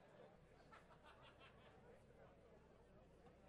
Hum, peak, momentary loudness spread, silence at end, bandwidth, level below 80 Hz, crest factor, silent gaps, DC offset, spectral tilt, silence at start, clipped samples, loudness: none; -50 dBFS; 4 LU; 0 s; 10 kHz; -76 dBFS; 18 dB; none; under 0.1%; -5.5 dB/octave; 0 s; under 0.1%; -68 LUFS